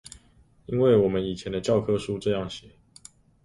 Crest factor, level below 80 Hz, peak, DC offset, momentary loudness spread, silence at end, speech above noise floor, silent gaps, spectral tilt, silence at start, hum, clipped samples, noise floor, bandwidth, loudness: 18 dB; -52 dBFS; -8 dBFS; under 0.1%; 15 LU; 0.85 s; 34 dB; none; -6.5 dB/octave; 0.7 s; none; under 0.1%; -58 dBFS; 11.5 kHz; -25 LUFS